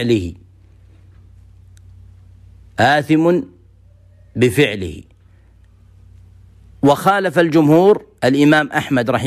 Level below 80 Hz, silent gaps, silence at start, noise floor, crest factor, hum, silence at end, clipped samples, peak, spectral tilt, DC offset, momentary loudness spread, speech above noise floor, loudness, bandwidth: -48 dBFS; none; 0 s; -48 dBFS; 14 dB; none; 0 s; under 0.1%; -2 dBFS; -6 dB/octave; under 0.1%; 18 LU; 34 dB; -15 LUFS; 15 kHz